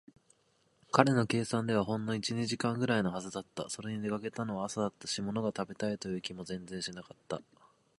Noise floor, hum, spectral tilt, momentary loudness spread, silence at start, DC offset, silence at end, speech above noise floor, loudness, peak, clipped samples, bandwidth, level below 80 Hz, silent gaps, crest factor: -72 dBFS; none; -5 dB/octave; 12 LU; 0.95 s; under 0.1%; 0.55 s; 38 dB; -34 LUFS; -6 dBFS; under 0.1%; 11.5 kHz; -68 dBFS; none; 28 dB